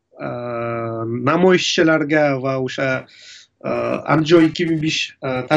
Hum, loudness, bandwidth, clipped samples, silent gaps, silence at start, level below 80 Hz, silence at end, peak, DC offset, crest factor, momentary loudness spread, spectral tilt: none; -18 LUFS; 8 kHz; under 0.1%; none; 0.2 s; -56 dBFS; 0 s; -2 dBFS; under 0.1%; 16 dB; 11 LU; -5.5 dB/octave